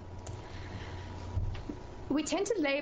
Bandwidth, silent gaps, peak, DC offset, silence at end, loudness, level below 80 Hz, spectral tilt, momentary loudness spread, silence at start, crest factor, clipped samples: 9.6 kHz; none; -18 dBFS; under 0.1%; 0 s; -37 LUFS; -46 dBFS; -5 dB/octave; 14 LU; 0 s; 16 dB; under 0.1%